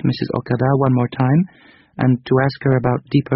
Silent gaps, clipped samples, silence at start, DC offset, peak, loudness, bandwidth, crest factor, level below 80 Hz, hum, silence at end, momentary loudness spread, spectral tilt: none; under 0.1%; 0.05 s; under 0.1%; -2 dBFS; -18 LUFS; 5.8 kHz; 16 dB; -48 dBFS; none; 0 s; 5 LU; -7.5 dB/octave